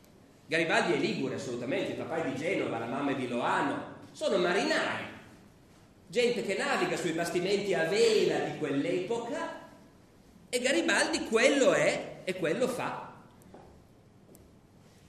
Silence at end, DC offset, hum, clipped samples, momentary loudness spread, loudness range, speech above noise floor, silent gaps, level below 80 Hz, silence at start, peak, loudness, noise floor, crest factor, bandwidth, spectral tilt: 0.7 s; under 0.1%; none; under 0.1%; 11 LU; 3 LU; 29 dB; none; -68 dBFS; 0.5 s; -10 dBFS; -30 LUFS; -58 dBFS; 20 dB; 14 kHz; -4 dB/octave